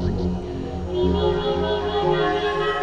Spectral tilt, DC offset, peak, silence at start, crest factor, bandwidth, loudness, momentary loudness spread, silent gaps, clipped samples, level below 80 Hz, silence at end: -7 dB/octave; under 0.1%; -8 dBFS; 0 s; 14 dB; 9 kHz; -23 LUFS; 7 LU; none; under 0.1%; -34 dBFS; 0 s